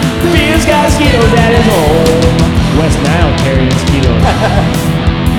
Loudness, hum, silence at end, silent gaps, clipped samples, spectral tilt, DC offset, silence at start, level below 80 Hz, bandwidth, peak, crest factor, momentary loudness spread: -9 LUFS; none; 0 s; none; 0.6%; -5.5 dB/octave; 1%; 0 s; -18 dBFS; 18.5 kHz; 0 dBFS; 8 dB; 3 LU